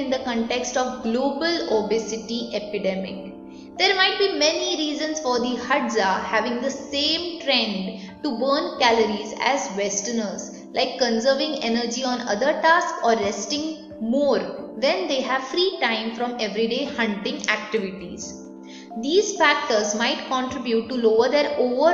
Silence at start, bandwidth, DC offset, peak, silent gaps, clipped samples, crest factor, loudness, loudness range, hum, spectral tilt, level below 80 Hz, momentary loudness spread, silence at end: 0 s; 7.8 kHz; under 0.1%; -2 dBFS; none; under 0.1%; 20 dB; -22 LUFS; 3 LU; none; -3 dB/octave; -60 dBFS; 12 LU; 0 s